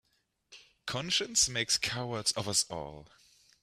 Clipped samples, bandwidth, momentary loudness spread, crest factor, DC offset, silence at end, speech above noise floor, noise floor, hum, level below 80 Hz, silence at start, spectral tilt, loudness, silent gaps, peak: under 0.1%; 15.5 kHz; 14 LU; 22 dB; under 0.1%; 0.6 s; 36 dB; -69 dBFS; none; -62 dBFS; 0.5 s; -1.5 dB/octave; -30 LUFS; none; -12 dBFS